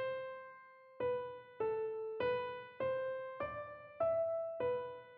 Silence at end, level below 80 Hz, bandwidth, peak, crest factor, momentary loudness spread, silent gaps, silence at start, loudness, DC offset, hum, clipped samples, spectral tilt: 0 s; -74 dBFS; 4.9 kHz; -26 dBFS; 14 dB; 12 LU; none; 0 s; -40 LUFS; under 0.1%; none; under 0.1%; -3 dB/octave